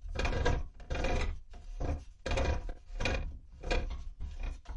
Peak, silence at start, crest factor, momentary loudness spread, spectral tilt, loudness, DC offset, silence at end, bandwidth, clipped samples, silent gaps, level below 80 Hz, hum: -16 dBFS; 0 s; 18 dB; 13 LU; -5.5 dB/octave; -37 LUFS; under 0.1%; 0 s; 9.2 kHz; under 0.1%; none; -36 dBFS; none